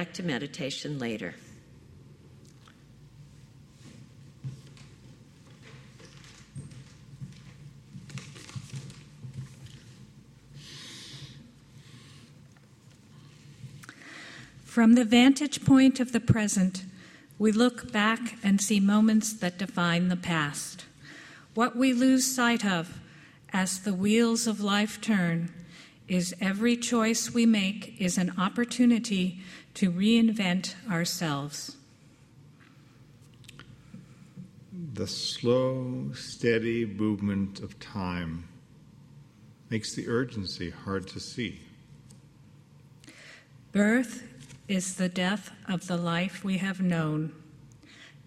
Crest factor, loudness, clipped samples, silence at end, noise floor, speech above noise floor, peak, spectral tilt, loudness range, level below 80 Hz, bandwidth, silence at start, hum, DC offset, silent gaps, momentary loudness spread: 20 dB; -27 LUFS; under 0.1%; 0.2 s; -57 dBFS; 30 dB; -8 dBFS; -4.5 dB/octave; 23 LU; -64 dBFS; 15 kHz; 0 s; none; under 0.1%; none; 24 LU